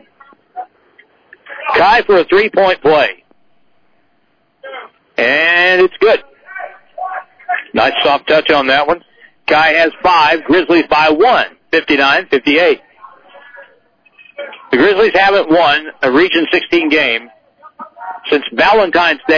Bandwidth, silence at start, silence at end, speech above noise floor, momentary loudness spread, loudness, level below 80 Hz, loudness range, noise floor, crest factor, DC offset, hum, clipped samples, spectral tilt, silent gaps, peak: 5.4 kHz; 0.55 s; 0 s; 49 dB; 19 LU; -11 LUFS; -48 dBFS; 4 LU; -59 dBFS; 12 dB; under 0.1%; none; under 0.1%; -5 dB/octave; none; -2 dBFS